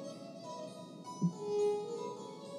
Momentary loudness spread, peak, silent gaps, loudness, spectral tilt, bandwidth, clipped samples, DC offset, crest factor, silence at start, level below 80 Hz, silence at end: 14 LU; -22 dBFS; none; -39 LUFS; -6.5 dB/octave; 12 kHz; under 0.1%; under 0.1%; 16 dB; 0 s; under -90 dBFS; 0 s